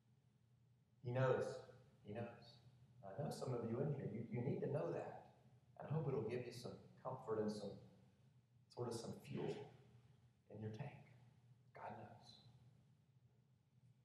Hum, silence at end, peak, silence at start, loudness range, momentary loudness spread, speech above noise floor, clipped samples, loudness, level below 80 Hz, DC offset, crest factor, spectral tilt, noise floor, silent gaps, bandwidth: none; 0.2 s; -28 dBFS; 1.05 s; 12 LU; 20 LU; 31 dB; under 0.1%; -48 LUFS; -84 dBFS; under 0.1%; 22 dB; -7 dB/octave; -76 dBFS; none; 12.5 kHz